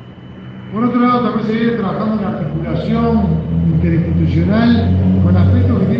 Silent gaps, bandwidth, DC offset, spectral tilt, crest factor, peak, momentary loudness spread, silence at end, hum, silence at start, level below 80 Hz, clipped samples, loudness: none; 5.6 kHz; under 0.1%; -10 dB/octave; 12 dB; -2 dBFS; 8 LU; 0 s; none; 0 s; -36 dBFS; under 0.1%; -14 LUFS